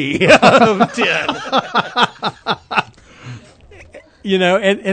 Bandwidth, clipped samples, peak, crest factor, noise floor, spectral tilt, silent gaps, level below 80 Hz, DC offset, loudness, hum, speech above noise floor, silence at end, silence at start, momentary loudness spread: 11 kHz; 0.2%; 0 dBFS; 16 dB; -42 dBFS; -4.5 dB/octave; none; -50 dBFS; under 0.1%; -14 LUFS; none; 28 dB; 0 s; 0 s; 16 LU